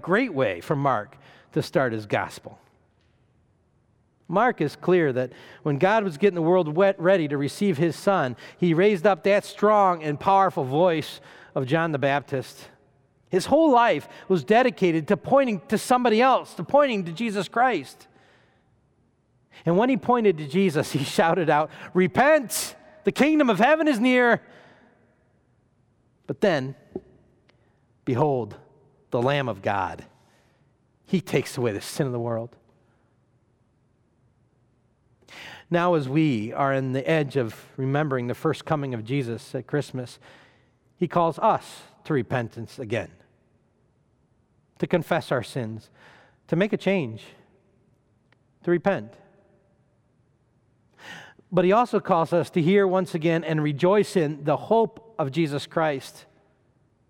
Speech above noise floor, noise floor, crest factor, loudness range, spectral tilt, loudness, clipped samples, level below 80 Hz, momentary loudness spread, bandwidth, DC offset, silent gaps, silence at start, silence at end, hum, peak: 42 dB; -65 dBFS; 18 dB; 9 LU; -6 dB/octave; -23 LUFS; under 0.1%; -66 dBFS; 14 LU; 17.5 kHz; under 0.1%; none; 0.05 s; 1 s; none; -8 dBFS